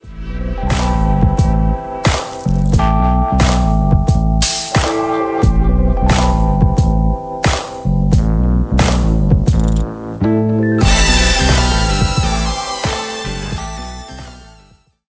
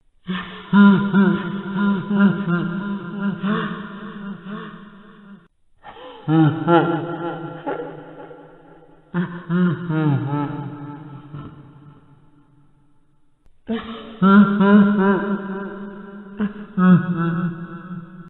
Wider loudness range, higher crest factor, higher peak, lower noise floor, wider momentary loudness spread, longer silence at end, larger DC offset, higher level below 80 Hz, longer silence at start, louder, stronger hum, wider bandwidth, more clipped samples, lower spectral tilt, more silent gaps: second, 2 LU vs 11 LU; second, 14 dB vs 20 dB; about the same, 0 dBFS vs -2 dBFS; second, -48 dBFS vs -55 dBFS; second, 10 LU vs 23 LU; first, 0.65 s vs 0 s; neither; first, -18 dBFS vs -56 dBFS; second, 0.05 s vs 0.25 s; first, -15 LUFS vs -19 LUFS; neither; first, 8 kHz vs 4.1 kHz; neither; second, -5.5 dB/octave vs -11 dB/octave; neither